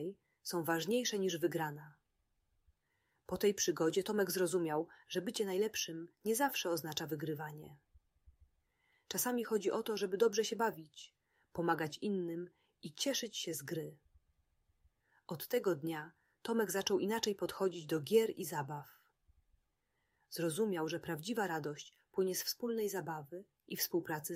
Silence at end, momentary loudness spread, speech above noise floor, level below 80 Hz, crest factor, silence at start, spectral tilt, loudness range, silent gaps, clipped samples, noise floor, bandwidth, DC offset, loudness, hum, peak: 0 s; 15 LU; 46 dB; -76 dBFS; 20 dB; 0 s; -4 dB/octave; 5 LU; none; under 0.1%; -83 dBFS; 16 kHz; under 0.1%; -37 LUFS; none; -18 dBFS